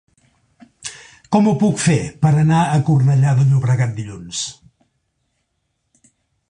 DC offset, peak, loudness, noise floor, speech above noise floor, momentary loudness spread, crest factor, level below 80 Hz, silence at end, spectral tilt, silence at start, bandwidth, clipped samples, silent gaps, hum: under 0.1%; -2 dBFS; -16 LUFS; -71 dBFS; 56 dB; 16 LU; 16 dB; -50 dBFS; 1.95 s; -6.5 dB/octave; 0.85 s; 10.5 kHz; under 0.1%; none; none